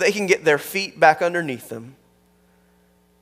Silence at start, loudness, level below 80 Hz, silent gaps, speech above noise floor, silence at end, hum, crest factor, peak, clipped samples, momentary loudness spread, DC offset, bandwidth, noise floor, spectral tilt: 0 s; -19 LUFS; -68 dBFS; none; 39 dB; 1.3 s; 60 Hz at -60 dBFS; 22 dB; 0 dBFS; under 0.1%; 17 LU; under 0.1%; 16 kHz; -59 dBFS; -4 dB/octave